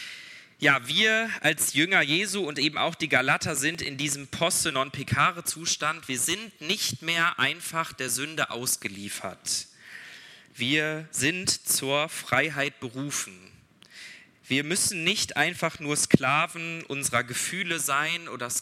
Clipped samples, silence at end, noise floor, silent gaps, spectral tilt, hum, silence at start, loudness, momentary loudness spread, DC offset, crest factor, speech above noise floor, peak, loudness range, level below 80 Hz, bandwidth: under 0.1%; 0 s; -52 dBFS; none; -2.5 dB/octave; none; 0 s; -25 LUFS; 12 LU; under 0.1%; 26 dB; 25 dB; -2 dBFS; 5 LU; -66 dBFS; 16.5 kHz